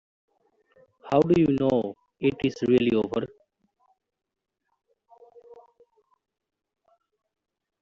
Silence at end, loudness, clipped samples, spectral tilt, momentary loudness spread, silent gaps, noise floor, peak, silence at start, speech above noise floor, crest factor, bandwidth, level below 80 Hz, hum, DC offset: 2.25 s; -24 LUFS; under 0.1%; -6.5 dB/octave; 10 LU; none; -69 dBFS; -8 dBFS; 1.05 s; 46 dB; 22 dB; 7.6 kHz; -60 dBFS; none; under 0.1%